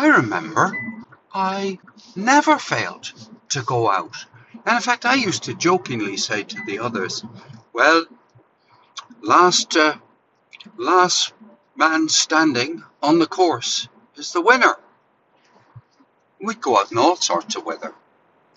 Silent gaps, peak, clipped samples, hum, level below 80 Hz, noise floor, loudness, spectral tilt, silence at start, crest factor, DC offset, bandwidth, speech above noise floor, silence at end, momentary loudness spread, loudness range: none; -2 dBFS; under 0.1%; none; -66 dBFS; -60 dBFS; -19 LUFS; -3 dB/octave; 0 s; 20 dB; under 0.1%; 8.2 kHz; 41 dB; 0.65 s; 18 LU; 4 LU